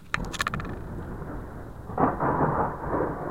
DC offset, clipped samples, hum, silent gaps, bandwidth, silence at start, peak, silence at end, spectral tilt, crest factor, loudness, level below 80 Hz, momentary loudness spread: 0.3%; under 0.1%; none; none; 16.5 kHz; 0 s; -6 dBFS; 0 s; -6 dB/octave; 22 dB; -29 LUFS; -42 dBFS; 13 LU